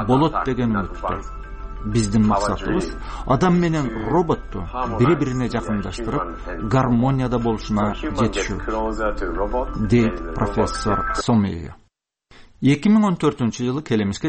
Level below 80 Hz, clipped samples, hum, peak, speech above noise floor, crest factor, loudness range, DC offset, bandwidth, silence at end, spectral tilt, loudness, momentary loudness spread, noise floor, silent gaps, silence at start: -32 dBFS; under 0.1%; none; -6 dBFS; 43 dB; 14 dB; 1 LU; under 0.1%; 8.8 kHz; 0 s; -6.5 dB/octave; -21 LUFS; 10 LU; -63 dBFS; none; 0 s